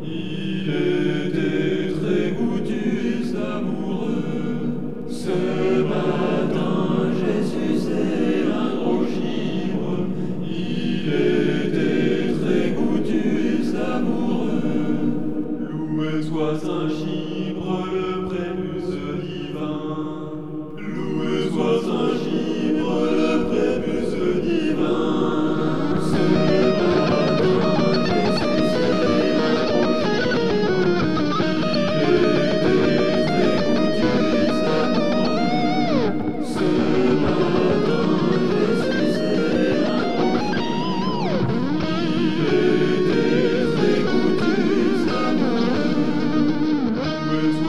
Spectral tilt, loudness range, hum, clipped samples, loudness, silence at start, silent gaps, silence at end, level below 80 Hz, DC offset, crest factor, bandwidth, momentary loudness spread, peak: -7 dB/octave; 6 LU; none; under 0.1%; -21 LUFS; 0 s; none; 0 s; -50 dBFS; 3%; 14 dB; 11.5 kHz; 7 LU; -6 dBFS